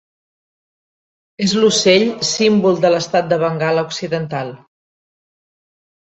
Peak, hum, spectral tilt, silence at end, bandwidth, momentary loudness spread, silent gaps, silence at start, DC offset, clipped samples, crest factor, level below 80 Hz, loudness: 0 dBFS; none; -4 dB/octave; 1.45 s; 8.2 kHz; 9 LU; none; 1.4 s; under 0.1%; under 0.1%; 18 dB; -60 dBFS; -15 LUFS